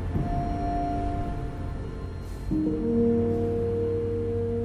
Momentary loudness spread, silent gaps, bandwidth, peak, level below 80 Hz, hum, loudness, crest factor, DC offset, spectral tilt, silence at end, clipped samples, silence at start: 11 LU; none; 11 kHz; -14 dBFS; -36 dBFS; none; -28 LUFS; 12 dB; under 0.1%; -9.5 dB/octave; 0 s; under 0.1%; 0 s